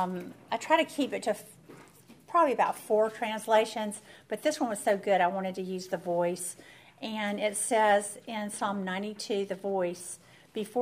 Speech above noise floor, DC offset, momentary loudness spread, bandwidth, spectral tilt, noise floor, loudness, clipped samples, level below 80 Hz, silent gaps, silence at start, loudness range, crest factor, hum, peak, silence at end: 25 dB; under 0.1%; 13 LU; 15.5 kHz; -3.5 dB/octave; -55 dBFS; -30 LUFS; under 0.1%; -78 dBFS; none; 0 s; 2 LU; 20 dB; none; -10 dBFS; 0 s